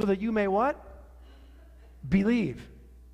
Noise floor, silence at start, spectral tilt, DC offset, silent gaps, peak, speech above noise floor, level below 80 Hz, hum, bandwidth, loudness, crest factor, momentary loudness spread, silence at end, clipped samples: -51 dBFS; 0 s; -8 dB/octave; under 0.1%; none; -12 dBFS; 24 dB; -48 dBFS; none; 9.4 kHz; -27 LUFS; 16 dB; 17 LU; 0.35 s; under 0.1%